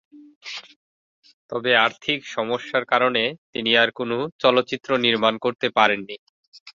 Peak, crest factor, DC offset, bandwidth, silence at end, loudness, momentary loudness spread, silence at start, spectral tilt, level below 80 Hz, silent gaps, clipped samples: -2 dBFS; 20 dB; under 0.1%; 7.4 kHz; 0.05 s; -21 LUFS; 17 LU; 0.15 s; -4.5 dB/octave; -68 dBFS; 0.36-0.41 s, 0.76-1.23 s, 1.33-1.49 s, 3.38-3.53 s, 4.32-4.39 s, 6.19-6.52 s, 6.60-6.66 s; under 0.1%